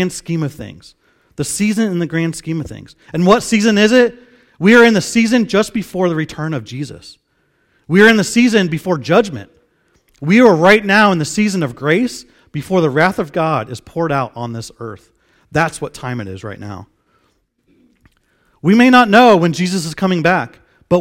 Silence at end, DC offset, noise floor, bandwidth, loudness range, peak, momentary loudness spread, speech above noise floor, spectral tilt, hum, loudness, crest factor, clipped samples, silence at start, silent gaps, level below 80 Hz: 0 s; under 0.1%; -61 dBFS; 16 kHz; 10 LU; 0 dBFS; 19 LU; 48 dB; -5.5 dB/octave; none; -13 LUFS; 14 dB; 0.2%; 0 s; none; -50 dBFS